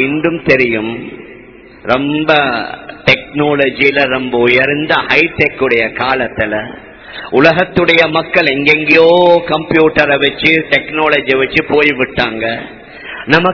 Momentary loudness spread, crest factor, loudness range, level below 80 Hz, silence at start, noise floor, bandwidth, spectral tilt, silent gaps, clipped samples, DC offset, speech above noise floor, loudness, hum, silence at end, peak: 12 LU; 12 dB; 4 LU; -42 dBFS; 0 s; -36 dBFS; 5.4 kHz; -6.5 dB/octave; none; 0.8%; under 0.1%; 25 dB; -11 LUFS; none; 0 s; 0 dBFS